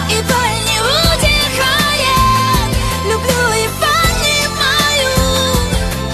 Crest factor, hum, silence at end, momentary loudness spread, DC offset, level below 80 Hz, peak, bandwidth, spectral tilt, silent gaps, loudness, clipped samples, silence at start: 14 dB; none; 0 s; 4 LU; under 0.1%; -24 dBFS; 0 dBFS; 14 kHz; -3 dB/octave; none; -12 LUFS; under 0.1%; 0 s